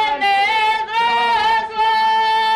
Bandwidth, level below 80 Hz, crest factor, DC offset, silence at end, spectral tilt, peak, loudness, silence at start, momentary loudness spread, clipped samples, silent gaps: 12.5 kHz; -54 dBFS; 8 dB; under 0.1%; 0 s; -1.5 dB/octave; -8 dBFS; -16 LUFS; 0 s; 2 LU; under 0.1%; none